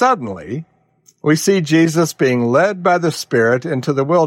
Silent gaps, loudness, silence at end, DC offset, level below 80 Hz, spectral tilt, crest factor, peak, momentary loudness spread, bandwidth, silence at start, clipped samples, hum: none; -16 LUFS; 0 s; under 0.1%; -62 dBFS; -5.5 dB/octave; 12 dB; -4 dBFS; 10 LU; 16.5 kHz; 0 s; under 0.1%; none